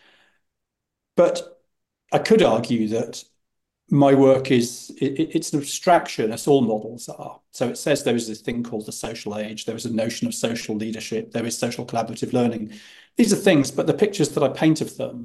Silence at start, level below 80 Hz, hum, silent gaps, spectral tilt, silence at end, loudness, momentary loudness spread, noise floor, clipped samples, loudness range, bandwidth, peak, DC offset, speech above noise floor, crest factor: 1.15 s; -60 dBFS; none; none; -5 dB/octave; 0 s; -22 LUFS; 13 LU; -83 dBFS; under 0.1%; 7 LU; 12.5 kHz; -4 dBFS; under 0.1%; 61 dB; 18 dB